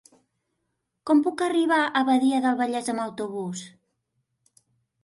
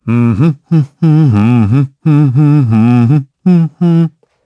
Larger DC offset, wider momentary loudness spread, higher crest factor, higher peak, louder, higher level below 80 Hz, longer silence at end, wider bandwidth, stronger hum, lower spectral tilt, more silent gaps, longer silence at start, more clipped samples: neither; first, 12 LU vs 4 LU; first, 16 dB vs 10 dB; second, -10 dBFS vs 0 dBFS; second, -24 LUFS vs -10 LUFS; second, -74 dBFS vs -50 dBFS; first, 1.35 s vs 0.35 s; first, 11.5 kHz vs 5.8 kHz; neither; second, -4.5 dB/octave vs -10 dB/octave; neither; first, 1.05 s vs 0.05 s; neither